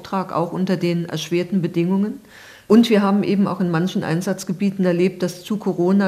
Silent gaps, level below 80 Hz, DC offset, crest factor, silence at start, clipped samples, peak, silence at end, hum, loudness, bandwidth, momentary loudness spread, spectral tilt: none; -62 dBFS; under 0.1%; 18 dB; 0 s; under 0.1%; -2 dBFS; 0 s; none; -20 LUFS; 14.5 kHz; 8 LU; -6.5 dB/octave